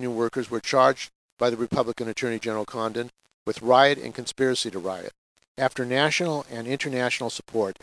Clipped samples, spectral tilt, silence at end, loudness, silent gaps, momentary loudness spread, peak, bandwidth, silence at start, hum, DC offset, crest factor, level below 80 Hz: under 0.1%; -4 dB/octave; 0.1 s; -25 LUFS; 1.15-1.37 s, 3.34-3.46 s, 5.18-5.36 s, 5.48-5.55 s; 13 LU; -4 dBFS; 11 kHz; 0 s; none; under 0.1%; 22 dB; -64 dBFS